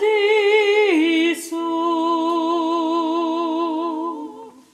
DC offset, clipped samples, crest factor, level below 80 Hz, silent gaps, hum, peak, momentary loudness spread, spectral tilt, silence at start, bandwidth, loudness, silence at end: under 0.1%; under 0.1%; 14 dB; -76 dBFS; none; none; -6 dBFS; 10 LU; -2 dB/octave; 0 s; 14 kHz; -19 LUFS; 0.25 s